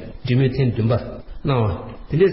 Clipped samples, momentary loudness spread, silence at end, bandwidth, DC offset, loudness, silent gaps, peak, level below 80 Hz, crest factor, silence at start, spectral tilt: under 0.1%; 10 LU; 0 s; 5.8 kHz; 0.7%; -21 LUFS; none; -4 dBFS; -38 dBFS; 16 dB; 0 s; -12.5 dB/octave